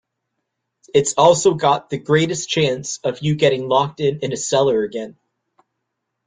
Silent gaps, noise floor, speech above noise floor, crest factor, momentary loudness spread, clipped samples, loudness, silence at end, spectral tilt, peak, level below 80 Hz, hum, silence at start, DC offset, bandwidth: none; -77 dBFS; 59 dB; 18 dB; 10 LU; under 0.1%; -18 LUFS; 1.15 s; -4.5 dB/octave; 0 dBFS; -58 dBFS; none; 0.95 s; under 0.1%; 9.6 kHz